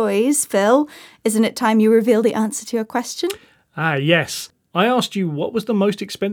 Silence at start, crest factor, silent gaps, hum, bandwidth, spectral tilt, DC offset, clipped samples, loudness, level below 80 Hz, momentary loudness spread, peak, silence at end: 0 s; 18 dB; none; none; 20 kHz; -4.5 dB/octave; under 0.1%; under 0.1%; -19 LUFS; -68 dBFS; 10 LU; 0 dBFS; 0 s